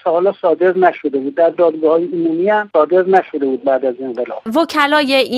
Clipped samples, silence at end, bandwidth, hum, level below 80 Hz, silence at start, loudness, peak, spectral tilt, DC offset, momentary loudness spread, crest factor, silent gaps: under 0.1%; 0 s; 14 kHz; none; -66 dBFS; 0.05 s; -15 LUFS; 0 dBFS; -5.5 dB/octave; under 0.1%; 7 LU; 14 dB; none